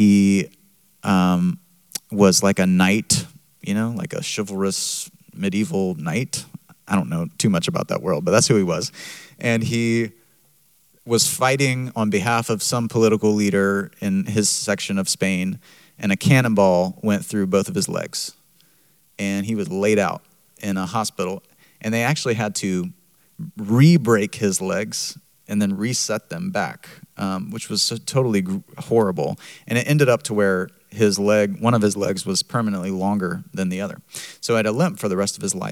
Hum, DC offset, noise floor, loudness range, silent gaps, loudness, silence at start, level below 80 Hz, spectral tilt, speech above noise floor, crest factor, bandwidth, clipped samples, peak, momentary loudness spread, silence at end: none; under 0.1%; -59 dBFS; 5 LU; none; -21 LUFS; 0 s; -64 dBFS; -5 dB/octave; 38 dB; 20 dB; 16.5 kHz; under 0.1%; -2 dBFS; 13 LU; 0 s